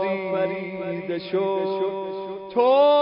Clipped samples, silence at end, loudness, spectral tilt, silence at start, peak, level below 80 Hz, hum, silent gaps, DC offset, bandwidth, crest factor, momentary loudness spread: under 0.1%; 0 s; -24 LUFS; -10 dB/octave; 0 s; -8 dBFS; -68 dBFS; none; none; under 0.1%; 5.4 kHz; 16 dB; 12 LU